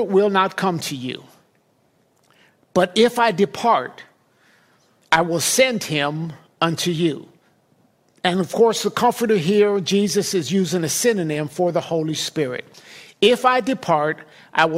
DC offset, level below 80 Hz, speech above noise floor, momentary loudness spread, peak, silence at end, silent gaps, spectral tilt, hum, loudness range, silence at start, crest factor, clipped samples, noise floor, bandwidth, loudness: under 0.1%; -62 dBFS; 43 dB; 9 LU; -2 dBFS; 0 s; none; -4 dB/octave; none; 3 LU; 0 s; 18 dB; under 0.1%; -62 dBFS; 16 kHz; -19 LUFS